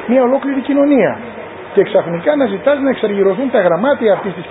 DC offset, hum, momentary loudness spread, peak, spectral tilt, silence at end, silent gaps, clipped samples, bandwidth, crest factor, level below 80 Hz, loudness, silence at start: under 0.1%; none; 5 LU; 0 dBFS; -11.5 dB/octave; 0 s; none; under 0.1%; 4 kHz; 14 dB; -54 dBFS; -14 LUFS; 0 s